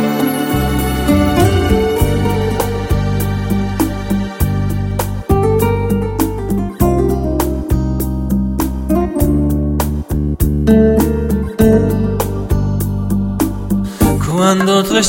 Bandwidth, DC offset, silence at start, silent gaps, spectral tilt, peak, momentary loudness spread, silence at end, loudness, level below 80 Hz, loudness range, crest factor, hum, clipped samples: 17 kHz; under 0.1%; 0 s; none; -6 dB/octave; 0 dBFS; 6 LU; 0 s; -15 LUFS; -22 dBFS; 2 LU; 14 dB; none; under 0.1%